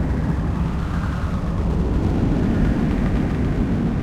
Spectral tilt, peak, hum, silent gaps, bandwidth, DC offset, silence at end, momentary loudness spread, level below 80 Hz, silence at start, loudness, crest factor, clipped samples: -8.5 dB/octave; -8 dBFS; none; none; 10 kHz; under 0.1%; 0 s; 4 LU; -24 dBFS; 0 s; -22 LUFS; 12 dB; under 0.1%